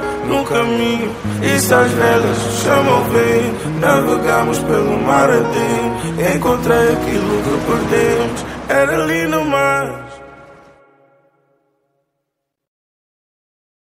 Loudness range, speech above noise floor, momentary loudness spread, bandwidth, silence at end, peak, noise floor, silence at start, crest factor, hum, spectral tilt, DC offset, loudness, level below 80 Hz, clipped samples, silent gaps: 6 LU; 61 dB; 7 LU; 16 kHz; 3.4 s; 0 dBFS; -76 dBFS; 0 s; 16 dB; none; -5 dB/octave; under 0.1%; -15 LUFS; -40 dBFS; under 0.1%; none